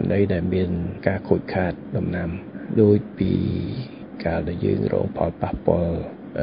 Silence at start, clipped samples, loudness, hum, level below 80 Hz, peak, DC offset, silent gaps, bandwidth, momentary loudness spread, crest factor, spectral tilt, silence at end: 0 s; under 0.1%; -23 LUFS; none; -38 dBFS; -2 dBFS; under 0.1%; none; 5.4 kHz; 11 LU; 20 dB; -13 dB/octave; 0 s